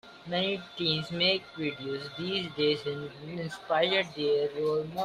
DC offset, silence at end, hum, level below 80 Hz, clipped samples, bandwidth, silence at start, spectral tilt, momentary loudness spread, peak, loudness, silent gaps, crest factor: under 0.1%; 0 s; none; -68 dBFS; under 0.1%; 14 kHz; 0.05 s; -5.5 dB/octave; 11 LU; -12 dBFS; -30 LUFS; none; 18 dB